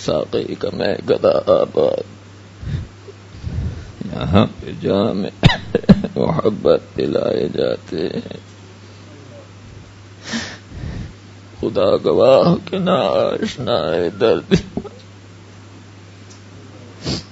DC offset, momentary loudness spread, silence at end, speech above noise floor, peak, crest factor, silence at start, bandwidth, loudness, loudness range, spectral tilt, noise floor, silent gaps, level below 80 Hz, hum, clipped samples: under 0.1%; 24 LU; 0 s; 23 dB; 0 dBFS; 18 dB; 0 s; 8 kHz; -18 LUFS; 10 LU; -6.5 dB/octave; -40 dBFS; none; -38 dBFS; none; under 0.1%